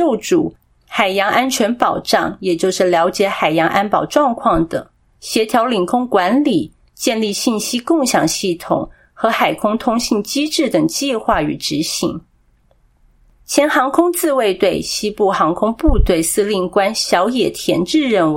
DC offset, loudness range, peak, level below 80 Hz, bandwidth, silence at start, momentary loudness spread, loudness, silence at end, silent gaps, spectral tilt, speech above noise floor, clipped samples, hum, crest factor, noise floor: under 0.1%; 3 LU; 0 dBFS; -32 dBFS; 16.5 kHz; 0 s; 6 LU; -16 LUFS; 0 s; none; -4 dB/octave; 39 dB; under 0.1%; none; 16 dB; -55 dBFS